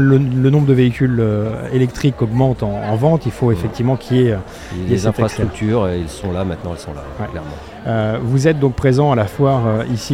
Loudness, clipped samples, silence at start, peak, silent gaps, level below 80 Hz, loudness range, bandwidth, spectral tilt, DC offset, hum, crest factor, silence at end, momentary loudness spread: -17 LUFS; under 0.1%; 0 s; 0 dBFS; none; -36 dBFS; 5 LU; 12 kHz; -7.5 dB/octave; under 0.1%; none; 14 dB; 0 s; 13 LU